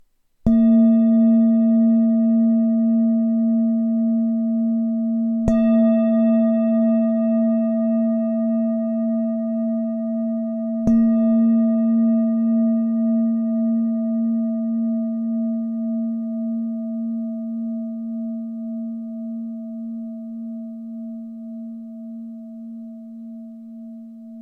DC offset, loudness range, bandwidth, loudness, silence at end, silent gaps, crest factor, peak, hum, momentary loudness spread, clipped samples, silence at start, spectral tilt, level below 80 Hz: under 0.1%; 15 LU; 2.8 kHz; -20 LUFS; 0 s; none; 16 dB; -4 dBFS; none; 18 LU; under 0.1%; 0.45 s; -11 dB/octave; -46 dBFS